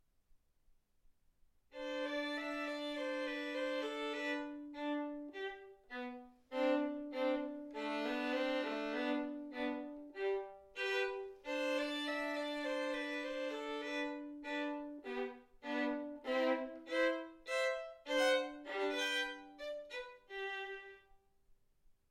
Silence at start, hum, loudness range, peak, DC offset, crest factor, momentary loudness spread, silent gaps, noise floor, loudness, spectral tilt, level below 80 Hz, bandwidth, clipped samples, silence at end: 0.35 s; none; 5 LU; -22 dBFS; under 0.1%; 18 dB; 11 LU; none; -72 dBFS; -40 LUFS; -2 dB/octave; -74 dBFS; 15.5 kHz; under 0.1%; 0.2 s